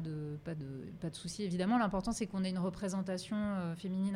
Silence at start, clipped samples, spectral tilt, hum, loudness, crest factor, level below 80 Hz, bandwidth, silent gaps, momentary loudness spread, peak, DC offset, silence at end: 0 s; under 0.1%; -6 dB/octave; none; -37 LUFS; 16 dB; -58 dBFS; 12 kHz; none; 11 LU; -20 dBFS; under 0.1%; 0 s